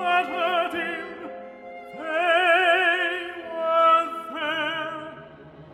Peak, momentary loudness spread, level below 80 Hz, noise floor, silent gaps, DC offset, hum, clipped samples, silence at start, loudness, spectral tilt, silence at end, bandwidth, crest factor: -8 dBFS; 21 LU; -68 dBFS; -45 dBFS; none; under 0.1%; none; under 0.1%; 0 s; -22 LUFS; -3.5 dB/octave; 0 s; 13.5 kHz; 16 dB